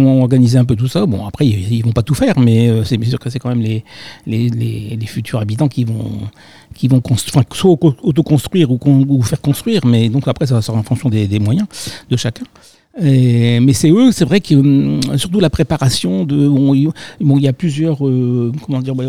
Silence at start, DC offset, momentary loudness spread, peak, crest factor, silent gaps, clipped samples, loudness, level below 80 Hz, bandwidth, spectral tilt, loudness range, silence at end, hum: 0 s; 0.6%; 9 LU; 0 dBFS; 12 dB; none; under 0.1%; -14 LUFS; -40 dBFS; 15.5 kHz; -7 dB/octave; 6 LU; 0 s; none